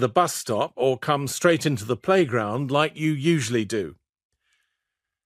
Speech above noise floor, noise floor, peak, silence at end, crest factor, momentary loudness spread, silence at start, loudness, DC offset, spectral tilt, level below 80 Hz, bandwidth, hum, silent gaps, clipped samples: 61 dB; -84 dBFS; -4 dBFS; 1.35 s; 20 dB; 6 LU; 0 s; -23 LUFS; under 0.1%; -5 dB/octave; -64 dBFS; 15.5 kHz; none; none; under 0.1%